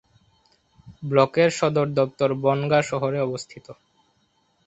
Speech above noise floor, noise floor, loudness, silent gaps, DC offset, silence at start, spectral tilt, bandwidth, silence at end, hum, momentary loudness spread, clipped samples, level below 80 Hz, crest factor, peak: 45 dB; -66 dBFS; -22 LUFS; none; under 0.1%; 0.85 s; -6 dB/octave; 8.2 kHz; 0.95 s; none; 15 LU; under 0.1%; -62 dBFS; 22 dB; -2 dBFS